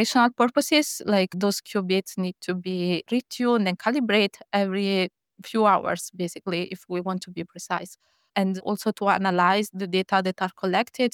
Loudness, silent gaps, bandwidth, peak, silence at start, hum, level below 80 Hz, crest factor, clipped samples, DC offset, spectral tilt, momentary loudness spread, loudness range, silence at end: -24 LUFS; none; 18 kHz; -6 dBFS; 0 s; none; -72 dBFS; 18 dB; under 0.1%; under 0.1%; -4.5 dB/octave; 10 LU; 4 LU; 0.05 s